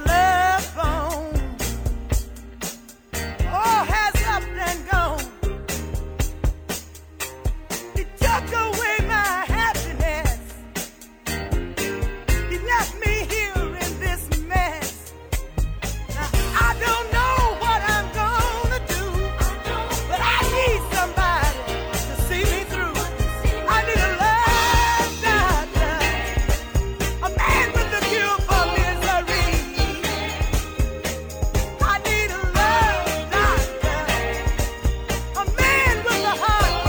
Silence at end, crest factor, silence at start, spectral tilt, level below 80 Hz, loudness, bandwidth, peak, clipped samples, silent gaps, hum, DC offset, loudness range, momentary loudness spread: 0 s; 16 dB; 0 s; -4 dB/octave; -26 dBFS; -22 LUFS; over 20 kHz; -4 dBFS; under 0.1%; none; none; under 0.1%; 5 LU; 10 LU